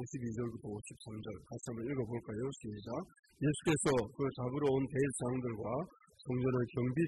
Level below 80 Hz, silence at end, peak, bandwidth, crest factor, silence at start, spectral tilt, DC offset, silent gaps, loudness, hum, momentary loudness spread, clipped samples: -62 dBFS; 0 s; -22 dBFS; 12 kHz; 16 dB; 0 s; -6 dB/octave; under 0.1%; 3.19-3.23 s; -38 LUFS; none; 13 LU; under 0.1%